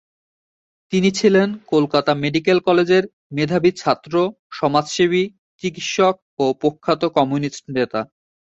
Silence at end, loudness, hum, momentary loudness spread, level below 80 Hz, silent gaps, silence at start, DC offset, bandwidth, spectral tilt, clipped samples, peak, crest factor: 0.45 s; -19 LUFS; none; 9 LU; -58 dBFS; 3.13-3.30 s, 4.39-4.50 s, 5.38-5.59 s, 6.22-6.37 s; 0.9 s; under 0.1%; 8 kHz; -5.5 dB/octave; under 0.1%; -2 dBFS; 16 dB